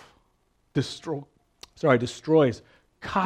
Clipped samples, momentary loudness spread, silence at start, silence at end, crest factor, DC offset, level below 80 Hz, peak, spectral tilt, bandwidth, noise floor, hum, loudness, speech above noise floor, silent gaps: under 0.1%; 14 LU; 0.75 s; 0 s; 22 dB; under 0.1%; -60 dBFS; -6 dBFS; -6.5 dB/octave; 10.5 kHz; -68 dBFS; none; -25 LUFS; 44 dB; none